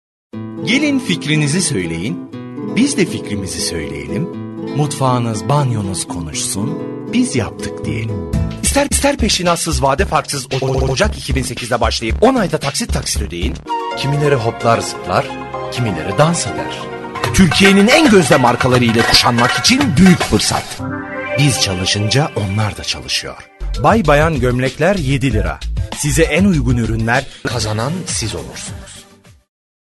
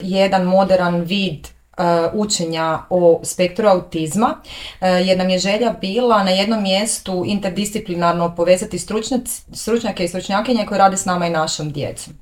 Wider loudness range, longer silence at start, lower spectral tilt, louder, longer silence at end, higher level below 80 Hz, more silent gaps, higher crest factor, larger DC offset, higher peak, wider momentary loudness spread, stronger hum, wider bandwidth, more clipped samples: first, 7 LU vs 2 LU; first, 0.35 s vs 0 s; about the same, -4.5 dB/octave vs -4.5 dB/octave; about the same, -15 LUFS vs -17 LUFS; first, 0.85 s vs 0.1 s; first, -28 dBFS vs -46 dBFS; neither; about the same, 16 dB vs 16 dB; neither; about the same, 0 dBFS vs 0 dBFS; first, 13 LU vs 8 LU; neither; second, 12.5 kHz vs 17 kHz; neither